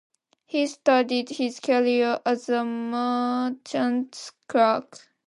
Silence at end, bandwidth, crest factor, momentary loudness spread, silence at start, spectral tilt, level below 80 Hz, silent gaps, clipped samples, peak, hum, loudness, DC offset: 0.45 s; 11 kHz; 18 dB; 8 LU; 0.55 s; -4 dB/octave; -80 dBFS; none; under 0.1%; -6 dBFS; none; -24 LUFS; under 0.1%